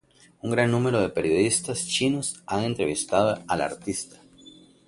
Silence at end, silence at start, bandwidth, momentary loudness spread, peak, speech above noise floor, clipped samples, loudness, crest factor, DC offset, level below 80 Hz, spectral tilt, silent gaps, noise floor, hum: 0.4 s; 0.45 s; 11.5 kHz; 9 LU; -6 dBFS; 26 dB; under 0.1%; -25 LUFS; 20 dB; under 0.1%; -56 dBFS; -4 dB/octave; none; -51 dBFS; none